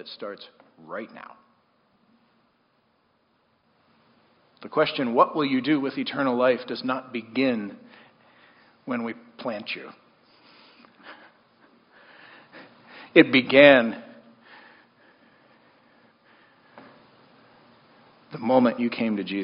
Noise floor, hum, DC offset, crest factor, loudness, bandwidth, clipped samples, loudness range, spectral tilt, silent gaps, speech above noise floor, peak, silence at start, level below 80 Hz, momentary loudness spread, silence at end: -67 dBFS; none; under 0.1%; 26 dB; -22 LUFS; 5.4 kHz; under 0.1%; 19 LU; -3 dB/octave; none; 45 dB; 0 dBFS; 0.05 s; -72 dBFS; 23 LU; 0 s